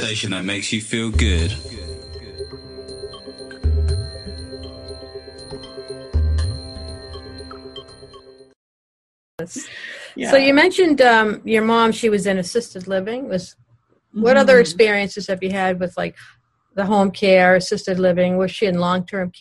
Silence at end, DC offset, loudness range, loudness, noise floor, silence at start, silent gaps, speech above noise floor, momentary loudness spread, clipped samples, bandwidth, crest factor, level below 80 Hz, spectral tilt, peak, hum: 0.1 s; under 0.1%; 12 LU; -18 LUFS; -59 dBFS; 0 s; 8.56-9.38 s; 42 dB; 22 LU; under 0.1%; 12 kHz; 18 dB; -32 dBFS; -5 dB/octave; -2 dBFS; none